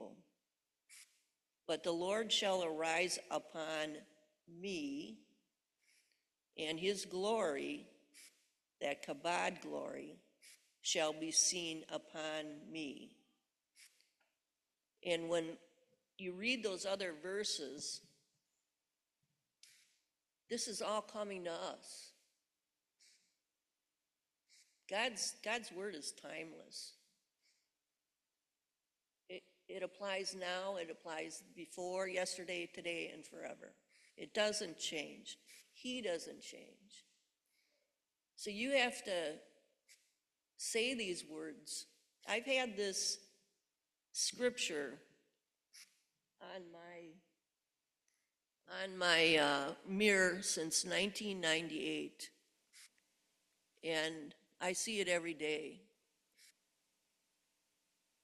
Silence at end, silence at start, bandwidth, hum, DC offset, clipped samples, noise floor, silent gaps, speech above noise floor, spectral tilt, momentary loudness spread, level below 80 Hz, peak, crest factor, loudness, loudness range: 1.8 s; 0 s; 13.5 kHz; none; under 0.1%; under 0.1%; under -90 dBFS; none; over 49 dB; -2 dB/octave; 19 LU; -84 dBFS; -16 dBFS; 28 dB; -40 LUFS; 12 LU